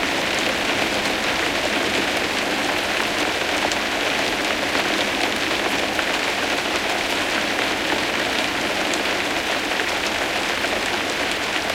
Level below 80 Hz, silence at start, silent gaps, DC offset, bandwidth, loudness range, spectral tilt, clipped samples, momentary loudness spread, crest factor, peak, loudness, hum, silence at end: -48 dBFS; 0 s; none; under 0.1%; 17 kHz; 1 LU; -2 dB/octave; under 0.1%; 1 LU; 18 dB; -4 dBFS; -20 LUFS; none; 0 s